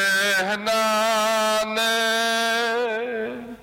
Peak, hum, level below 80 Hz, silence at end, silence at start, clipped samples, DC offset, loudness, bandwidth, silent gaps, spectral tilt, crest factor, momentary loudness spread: -14 dBFS; none; -62 dBFS; 0 s; 0 s; under 0.1%; under 0.1%; -21 LUFS; 16.5 kHz; none; -1.5 dB/octave; 8 dB; 7 LU